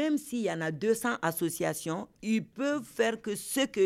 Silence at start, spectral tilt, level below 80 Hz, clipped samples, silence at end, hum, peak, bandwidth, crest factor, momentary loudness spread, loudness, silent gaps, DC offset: 0 s; -4.5 dB/octave; -70 dBFS; under 0.1%; 0 s; none; -14 dBFS; 16.5 kHz; 16 dB; 5 LU; -31 LUFS; none; under 0.1%